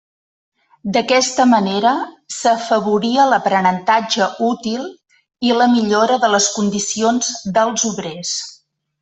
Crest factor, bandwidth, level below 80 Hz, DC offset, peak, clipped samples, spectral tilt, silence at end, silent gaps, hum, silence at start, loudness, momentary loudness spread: 14 dB; 8.4 kHz; -60 dBFS; under 0.1%; -2 dBFS; under 0.1%; -3 dB/octave; 0.45 s; none; none; 0.85 s; -16 LUFS; 9 LU